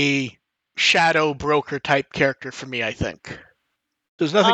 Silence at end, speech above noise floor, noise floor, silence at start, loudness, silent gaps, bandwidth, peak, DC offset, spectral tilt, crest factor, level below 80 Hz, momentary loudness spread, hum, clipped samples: 0 s; 56 dB; -76 dBFS; 0 s; -20 LUFS; 4.08-4.18 s; 8.8 kHz; -2 dBFS; under 0.1%; -4 dB/octave; 20 dB; -52 dBFS; 18 LU; none; under 0.1%